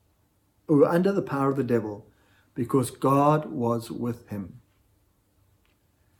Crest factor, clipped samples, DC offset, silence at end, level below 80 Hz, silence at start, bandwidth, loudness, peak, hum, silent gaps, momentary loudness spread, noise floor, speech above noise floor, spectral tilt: 20 dB; under 0.1%; under 0.1%; 1.6 s; -66 dBFS; 0.7 s; 17.5 kHz; -25 LUFS; -8 dBFS; none; none; 17 LU; -67 dBFS; 43 dB; -7.5 dB/octave